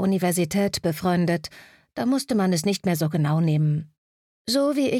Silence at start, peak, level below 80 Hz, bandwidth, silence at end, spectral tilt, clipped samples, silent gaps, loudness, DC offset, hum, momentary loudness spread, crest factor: 0 s; -10 dBFS; -58 dBFS; 16 kHz; 0 s; -6 dB/octave; under 0.1%; 3.98-4.45 s; -23 LUFS; under 0.1%; none; 7 LU; 12 dB